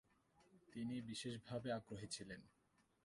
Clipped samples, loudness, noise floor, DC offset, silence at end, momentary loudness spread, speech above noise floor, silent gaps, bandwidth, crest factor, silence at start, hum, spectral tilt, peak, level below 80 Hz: under 0.1%; -50 LUFS; -76 dBFS; under 0.1%; 0.55 s; 10 LU; 27 dB; none; 11.5 kHz; 18 dB; 0.4 s; none; -4.5 dB/octave; -34 dBFS; -78 dBFS